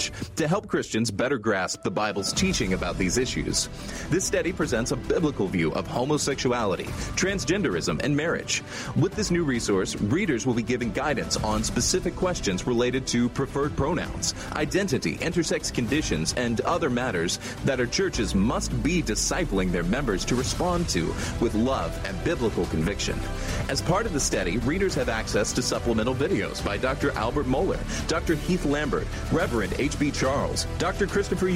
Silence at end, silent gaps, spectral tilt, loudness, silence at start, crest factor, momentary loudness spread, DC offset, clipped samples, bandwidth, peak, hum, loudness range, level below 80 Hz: 0 s; none; -4.5 dB/octave; -26 LUFS; 0 s; 14 dB; 3 LU; under 0.1%; under 0.1%; 16 kHz; -10 dBFS; none; 1 LU; -38 dBFS